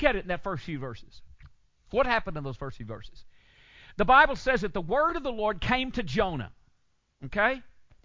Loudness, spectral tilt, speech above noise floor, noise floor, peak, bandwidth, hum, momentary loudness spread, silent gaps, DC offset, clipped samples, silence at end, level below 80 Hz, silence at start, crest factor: -27 LUFS; -6 dB/octave; 41 dB; -68 dBFS; -6 dBFS; 7.6 kHz; none; 21 LU; none; under 0.1%; under 0.1%; 0.35 s; -46 dBFS; 0 s; 22 dB